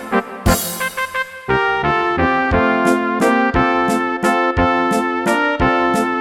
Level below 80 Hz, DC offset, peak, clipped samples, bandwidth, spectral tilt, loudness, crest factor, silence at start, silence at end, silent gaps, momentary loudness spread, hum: -32 dBFS; under 0.1%; 0 dBFS; under 0.1%; 18 kHz; -5 dB/octave; -16 LUFS; 16 dB; 0 s; 0 s; none; 6 LU; none